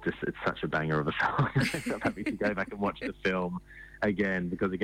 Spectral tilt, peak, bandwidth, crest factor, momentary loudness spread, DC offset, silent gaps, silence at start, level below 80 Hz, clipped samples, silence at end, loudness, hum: -6.5 dB/octave; -18 dBFS; 16 kHz; 12 dB; 5 LU; under 0.1%; none; 0 s; -54 dBFS; under 0.1%; 0 s; -31 LUFS; none